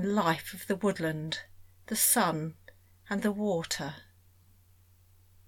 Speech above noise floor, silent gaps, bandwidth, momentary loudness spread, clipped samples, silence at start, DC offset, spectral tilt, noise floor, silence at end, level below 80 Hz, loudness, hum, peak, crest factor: 31 dB; none; 19 kHz; 14 LU; under 0.1%; 0 s; under 0.1%; -3.5 dB/octave; -61 dBFS; 1.45 s; -64 dBFS; -30 LUFS; none; -12 dBFS; 20 dB